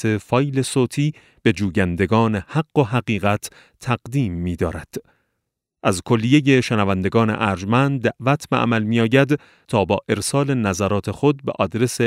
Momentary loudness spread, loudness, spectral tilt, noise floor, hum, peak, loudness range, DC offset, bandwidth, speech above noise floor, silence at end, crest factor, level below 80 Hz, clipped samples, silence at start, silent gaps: 8 LU; -20 LUFS; -6 dB/octave; -78 dBFS; none; -2 dBFS; 5 LU; under 0.1%; 15.5 kHz; 59 dB; 0 s; 16 dB; -48 dBFS; under 0.1%; 0 s; none